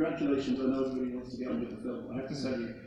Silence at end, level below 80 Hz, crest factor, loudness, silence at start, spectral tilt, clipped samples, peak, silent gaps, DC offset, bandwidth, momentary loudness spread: 0 s; -60 dBFS; 16 dB; -34 LUFS; 0 s; -7 dB/octave; under 0.1%; -18 dBFS; none; under 0.1%; 9.4 kHz; 8 LU